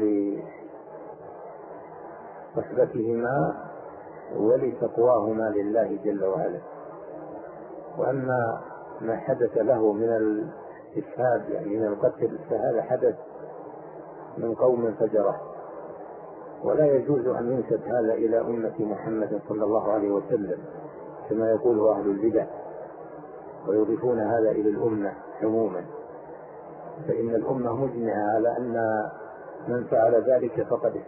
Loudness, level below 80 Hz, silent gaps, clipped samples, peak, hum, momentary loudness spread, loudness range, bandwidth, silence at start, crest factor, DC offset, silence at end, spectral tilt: -26 LUFS; -64 dBFS; none; under 0.1%; -10 dBFS; none; 19 LU; 4 LU; 2.9 kHz; 0 s; 16 dB; under 0.1%; 0 s; -13 dB/octave